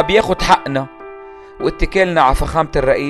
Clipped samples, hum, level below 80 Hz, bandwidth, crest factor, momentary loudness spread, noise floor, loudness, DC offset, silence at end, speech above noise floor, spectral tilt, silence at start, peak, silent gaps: under 0.1%; none; -26 dBFS; 14 kHz; 16 dB; 19 LU; -35 dBFS; -15 LUFS; under 0.1%; 0 s; 21 dB; -5 dB/octave; 0 s; 0 dBFS; none